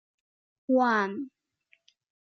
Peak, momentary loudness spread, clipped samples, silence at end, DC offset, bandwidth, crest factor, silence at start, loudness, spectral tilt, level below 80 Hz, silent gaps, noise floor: -14 dBFS; 20 LU; under 0.1%; 1.05 s; under 0.1%; 6.4 kHz; 16 dB; 0.7 s; -26 LUFS; -6 dB/octave; -86 dBFS; none; -69 dBFS